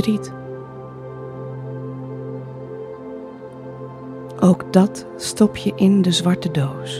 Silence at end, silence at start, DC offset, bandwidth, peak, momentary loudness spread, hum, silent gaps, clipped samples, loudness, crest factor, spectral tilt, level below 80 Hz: 0 s; 0 s; under 0.1%; 13 kHz; 0 dBFS; 18 LU; none; none; under 0.1%; -19 LUFS; 20 dB; -6 dB/octave; -54 dBFS